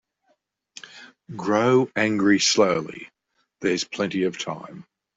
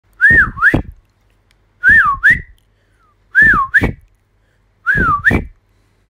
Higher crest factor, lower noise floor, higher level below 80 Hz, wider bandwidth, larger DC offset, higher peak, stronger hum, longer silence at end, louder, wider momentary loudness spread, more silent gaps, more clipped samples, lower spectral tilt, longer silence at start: first, 20 dB vs 14 dB; first, -69 dBFS vs -57 dBFS; second, -66 dBFS vs -30 dBFS; second, 8.2 kHz vs 16 kHz; neither; about the same, -4 dBFS vs -2 dBFS; neither; second, 0.35 s vs 0.65 s; second, -22 LUFS vs -11 LUFS; first, 23 LU vs 10 LU; neither; neither; second, -4 dB/octave vs -6 dB/octave; first, 0.85 s vs 0.2 s